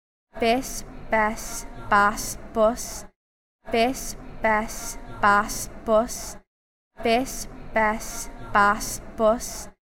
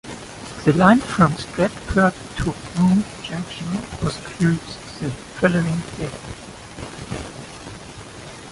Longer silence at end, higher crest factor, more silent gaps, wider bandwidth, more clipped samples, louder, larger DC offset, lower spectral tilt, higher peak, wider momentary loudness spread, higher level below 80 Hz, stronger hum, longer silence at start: first, 0.3 s vs 0 s; about the same, 18 dB vs 20 dB; first, 3.16-3.59 s, 6.47-6.91 s vs none; first, 16.5 kHz vs 11.5 kHz; neither; second, -24 LUFS vs -21 LUFS; neither; second, -3 dB/octave vs -6 dB/octave; second, -6 dBFS vs -2 dBFS; second, 15 LU vs 20 LU; about the same, -40 dBFS vs -42 dBFS; neither; first, 0.35 s vs 0.05 s